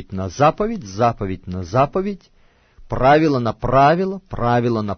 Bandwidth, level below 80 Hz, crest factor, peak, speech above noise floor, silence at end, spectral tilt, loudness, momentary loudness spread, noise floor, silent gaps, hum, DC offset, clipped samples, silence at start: 6.6 kHz; -38 dBFS; 16 dB; -4 dBFS; 30 dB; 0 s; -7 dB/octave; -18 LUFS; 14 LU; -48 dBFS; none; none; under 0.1%; under 0.1%; 0 s